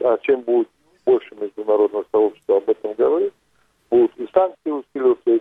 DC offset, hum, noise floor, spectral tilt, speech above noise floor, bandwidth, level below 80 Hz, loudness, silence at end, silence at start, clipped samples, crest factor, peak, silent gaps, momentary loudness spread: under 0.1%; none; -62 dBFS; -8 dB/octave; 44 dB; 3.8 kHz; -66 dBFS; -20 LUFS; 0 s; 0 s; under 0.1%; 18 dB; -2 dBFS; none; 8 LU